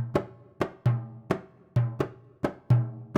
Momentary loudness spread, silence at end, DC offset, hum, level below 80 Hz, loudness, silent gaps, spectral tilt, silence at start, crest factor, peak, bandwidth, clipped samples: 8 LU; 0 s; under 0.1%; none; -56 dBFS; -30 LUFS; none; -9 dB/octave; 0 s; 18 dB; -10 dBFS; 7.2 kHz; under 0.1%